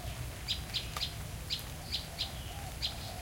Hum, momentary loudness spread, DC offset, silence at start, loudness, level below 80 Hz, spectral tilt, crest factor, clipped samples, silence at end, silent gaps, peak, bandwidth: none; 7 LU; under 0.1%; 0 s; -38 LUFS; -46 dBFS; -3 dB/octave; 20 dB; under 0.1%; 0 s; none; -20 dBFS; 17 kHz